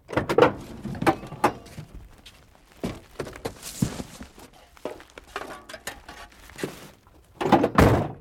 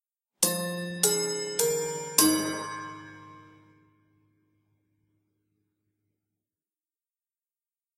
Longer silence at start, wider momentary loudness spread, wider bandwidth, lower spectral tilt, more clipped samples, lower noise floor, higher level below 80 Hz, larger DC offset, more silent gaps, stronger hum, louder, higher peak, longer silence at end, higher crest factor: second, 0.1 s vs 0.4 s; first, 24 LU vs 17 LU; about the same, 17 kHz vs 16 kHz; first, -6 dB/octave vs -2.5 dB/octave; neither; second, -53 dBFS vs under -90 dBFS; first, -42 dBFS vs -76 dBFS; neither; neither; neither; about the same, -25 LUFS vs -26 LUFS; second, -4 dBFS vs 0 dBFS; second, 0 s vs 4.55 s; second, 24 dB vs 32 dB